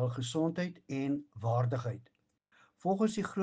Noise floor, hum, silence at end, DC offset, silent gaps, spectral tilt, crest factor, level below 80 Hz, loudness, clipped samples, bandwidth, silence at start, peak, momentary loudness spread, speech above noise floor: -70 dBFS; none; 0 s; under 0.1%; none; -7 dB/octave; 16 dB; -72 dBFS; -34 LUFS; under 0.1%; 9.4 kHz; 0 s; -18 dBFS; 7 LU; 37 dB